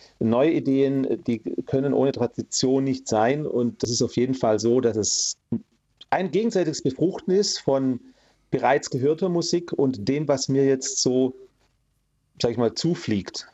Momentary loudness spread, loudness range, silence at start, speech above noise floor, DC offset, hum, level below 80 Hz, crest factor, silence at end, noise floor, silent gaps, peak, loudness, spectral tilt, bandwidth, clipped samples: 6 LU; 2 LU; 0.2 s; 47 dB; under 0.1%; none; -62 dBFS; 16 dB; 0.1 s; -70 dBFS; none; -6 dBFS; -23 LUFS; -4.5 dB/octave; 8.4 kHz; under 0.1%